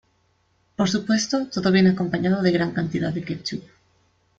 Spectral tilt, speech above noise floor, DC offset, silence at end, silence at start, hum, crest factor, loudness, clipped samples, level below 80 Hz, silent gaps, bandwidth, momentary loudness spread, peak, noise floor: -5.5 dB/octave; 44 dB; under 0.1%; 0.8 s; 0.8 s; none; 16 dB; -22 LUFS; under 0.1%; -56 dBFS; none; 7.8 kHz; 12 LU; -6 dBFS; -65 dBFS